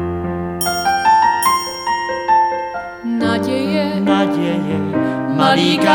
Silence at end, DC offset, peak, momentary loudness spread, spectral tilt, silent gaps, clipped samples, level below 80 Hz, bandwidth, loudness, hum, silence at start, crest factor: 0 s; under 0.1%; 0 dBFS; 9 LU; -4.5 dB/octave; none; under 0.1%; -46 dBFS; 19.5 kHz; -16 LUFS; none; 0 s; 16 dB